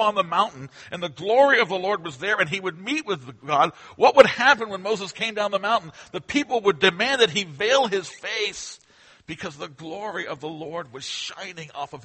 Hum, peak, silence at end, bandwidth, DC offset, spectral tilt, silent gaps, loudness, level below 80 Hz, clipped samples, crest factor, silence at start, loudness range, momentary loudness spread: none; 0 dBFS; 0.05 s; 8.8 kHz; under 0.1%; -3.5 dB/octave; none; -22 LUFS; -64 dBFS; under 0.1%; 24 dB; 0 s; 11 LU; 17 LU